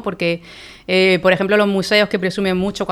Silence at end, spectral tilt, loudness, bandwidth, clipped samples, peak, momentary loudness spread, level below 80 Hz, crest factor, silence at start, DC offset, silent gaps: 0 s; -5.5 dB/octave; -16 LUFS; 14 kHz; under 0.1%; -2 dBFS; 10 LU; -48 dBFS; 16 dB; 0 s; under 0.1%; none